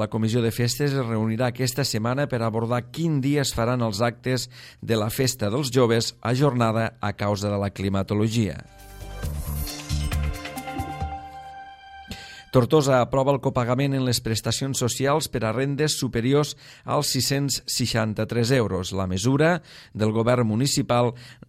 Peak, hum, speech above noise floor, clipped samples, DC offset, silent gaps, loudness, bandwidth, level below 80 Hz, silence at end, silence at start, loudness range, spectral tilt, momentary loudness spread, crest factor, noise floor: -4 dBFS; none; 20 dB; under 0.1%; under 0.1%; none; -24 LUFS; 16 kHz; -42 dBFS; 0.15 s; 0 s; 5 LU; -5 dB/octave; 12 LU; 20 dB; -43 dBFS